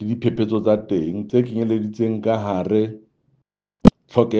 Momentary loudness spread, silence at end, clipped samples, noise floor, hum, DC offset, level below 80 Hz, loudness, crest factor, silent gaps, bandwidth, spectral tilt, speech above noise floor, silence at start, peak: 6 LU; 0 s; under 0.1%; -68 dBFS; none; under 0.1%; -40 dBFS; -20 LUFS; 20 dB; none; 8 kHz; -9 dB/octave; 48 dB; 0 s; 0 dBFS